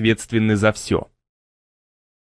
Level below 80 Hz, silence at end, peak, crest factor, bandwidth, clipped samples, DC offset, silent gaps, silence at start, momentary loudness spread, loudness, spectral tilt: -48 dBFS; 1.2 s; -2 dBFS; 20 dB; 11 kHz; under 0.1%; under 0.1%; none; 0 s; 7 LU; -20 LUFS; -5.5 dB/octave